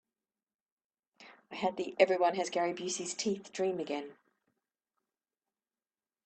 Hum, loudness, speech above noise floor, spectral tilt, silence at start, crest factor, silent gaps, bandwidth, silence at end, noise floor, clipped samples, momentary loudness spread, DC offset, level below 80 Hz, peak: none; -33 LUFS; over 57 dB; -3.5 dB/octave; 1.2 s; 26 dB; none; 9 kHz; 2.1 s; under -90 dBFS; under 0.1%; 11 LU; under 0.1%; -82 dBFS; -10 dBFS